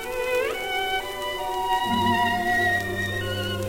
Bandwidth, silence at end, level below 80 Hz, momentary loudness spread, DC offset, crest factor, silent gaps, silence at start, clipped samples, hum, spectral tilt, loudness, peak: 16.5 kHz; 0 s; -46 dBFS; 6 LU; 0.3%; 16 dB; none; 0 s; under 0.1%; none; -4 dB/octave; -24 LUFS; -10 dBFS